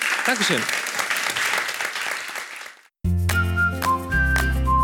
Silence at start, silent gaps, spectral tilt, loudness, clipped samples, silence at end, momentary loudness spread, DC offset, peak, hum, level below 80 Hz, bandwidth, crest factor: 0 s; none; -3.5 dB/octave; -22 LUFS; under 0.1%; 0 s; 11 LU; under 0.1%; -8 dBFS; none; -30 dBFS; 19.5 kHz; 16 dB